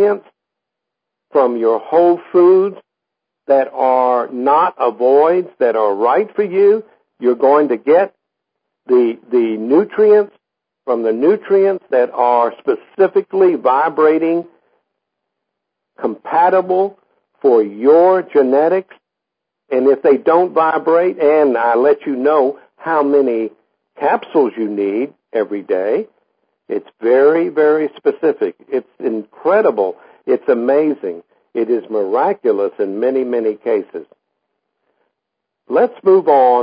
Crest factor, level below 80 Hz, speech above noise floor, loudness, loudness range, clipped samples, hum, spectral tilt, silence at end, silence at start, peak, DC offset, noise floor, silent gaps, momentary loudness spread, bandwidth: 14 dB; -76 dBFS; 66 dB; -15 LUFS; 4 LU; under 0.1%; none; -11.5 dB/octave; 0 s; 0 s; 0 dBFS; under 0.1%; -80 dBFS; none; 10 LU; 5.2 kHz